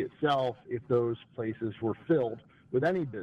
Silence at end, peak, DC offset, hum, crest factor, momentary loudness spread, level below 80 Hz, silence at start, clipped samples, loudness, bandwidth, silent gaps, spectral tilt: 0 s; -16 dBFS; under 0.1%; none; 14 dB; 8 LU; -68 dBFS; 0 s; under 0.1%; -31 LUFS; 7.8 kHz; none; -8 dB/octave